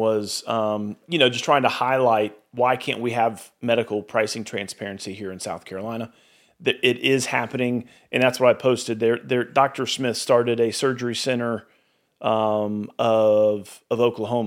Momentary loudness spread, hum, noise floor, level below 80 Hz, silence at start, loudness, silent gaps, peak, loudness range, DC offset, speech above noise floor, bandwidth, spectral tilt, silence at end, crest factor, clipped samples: 12 LU; none; -57 dBFS; -72 dBFS; 0 s; -22 LUFS; none; -2 dBFS; 5 LU; under 0.1%; 34 dB; 16.5 kHz; -4.5 dB/octave; 0 s; 20 dB; under 0.1%